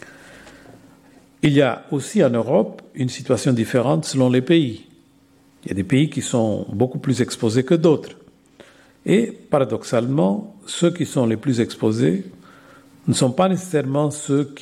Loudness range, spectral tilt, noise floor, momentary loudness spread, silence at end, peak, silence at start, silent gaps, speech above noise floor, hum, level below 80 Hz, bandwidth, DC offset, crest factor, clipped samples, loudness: 2 LU; -6 dB/octave; -54 dBFS; 10 LU; 0.05 s; -2 dBFS; 0.05 s; none; 35 dB; none; -60 dBFS; 14.5 kHz; under 0.1%; 18 dB; under 0.1%; -20 LUFS